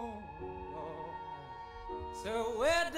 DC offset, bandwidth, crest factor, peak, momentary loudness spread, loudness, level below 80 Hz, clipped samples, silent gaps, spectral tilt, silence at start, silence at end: under 0.1%; 16 kHz; 16 dB; -20 dBFS; 15 LU; -39 LUFS; -54 dBFS; under 0.1%; none; -3.5 dB/octave; 0 s; 0 s